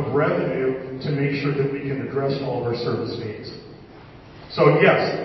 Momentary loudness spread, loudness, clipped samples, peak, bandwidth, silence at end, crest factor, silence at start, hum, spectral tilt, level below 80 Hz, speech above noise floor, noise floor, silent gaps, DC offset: 16 LU; -22 LUFS; under 0.1%; -2 dBFS; 6 kHz; 0 s; 20 dB; 0 s; none; -8.5 dB/octave; -54 dBFS; 22 dB; -43 dBFS; none; under 0.1%